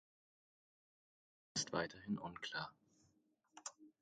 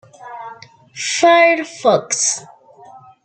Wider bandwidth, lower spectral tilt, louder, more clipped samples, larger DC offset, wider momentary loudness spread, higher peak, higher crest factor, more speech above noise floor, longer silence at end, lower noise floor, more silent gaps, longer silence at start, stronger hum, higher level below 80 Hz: about the same, 9 kHz vs 9.2 kHz; first, -3 dB/octave vs -1.5 dB/octave; second, -46 LUFS vs -15 LUFS; neither; neither; second, 12 LU vs 24 LU; second, -24 dBFS vs -2 dBFS; first, 26 dB vs 16 dB; first, 34 dB vs 28 dB; second, 0.1 s vs 0.8 s; first, -79 dBFS vs -42 dBFS; neither; first, 1.55 s vs 0.2 s; neither; second, -78 dBFS vs -68 dBFS